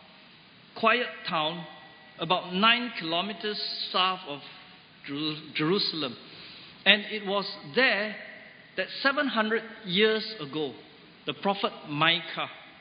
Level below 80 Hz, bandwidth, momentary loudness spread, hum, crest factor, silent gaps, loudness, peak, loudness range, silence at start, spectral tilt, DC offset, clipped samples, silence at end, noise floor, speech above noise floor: -76 dBFS; 5.2 kHz; 21 LU; none; 26 dB; none; -27 LUFS; -4 dBFS; 3 LU; 0.75 s; -8.5 dB/octave; under 0.1%; under 0.1%; 0 s; -54 dBFS; 26 dB